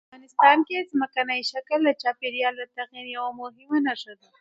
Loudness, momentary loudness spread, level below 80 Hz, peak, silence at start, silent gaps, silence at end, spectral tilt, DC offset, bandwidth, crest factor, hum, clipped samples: -24 LUFS; 17 LU; -80 dBFS; -2 dBFS; 0.15 s; none; 0.25 s; -3 dB/octave; under 0.1%; 7.8 kHz; 22 dB; none; under 0.1%